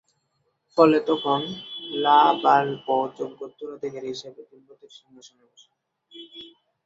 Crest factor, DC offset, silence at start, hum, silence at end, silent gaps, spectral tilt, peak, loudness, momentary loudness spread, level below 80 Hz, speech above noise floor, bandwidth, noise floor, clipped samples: 22 dB; under 0.1%; 0.75 s; none; 0.4 s; none; -5.5 dB/octave; -4 dBFS; -22 LUFS; 23 LU; -72 dBFS; 49 dB; 7.8 kHz; -73 dBFS; under 0.1%